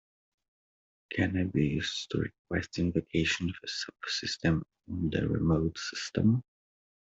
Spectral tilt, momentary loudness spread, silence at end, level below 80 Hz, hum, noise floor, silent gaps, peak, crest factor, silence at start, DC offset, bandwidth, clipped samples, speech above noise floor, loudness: -5.5 dB/octave; 7 LU; 0.65 s; -54 dBFS; none; under -90 dBFS; 2.39-2.45 s; -14 dBFS; 18 dB; 1.1 s; under 0.1%; 8 kHz; under 0.1%; over 59 dB; -31 LUFS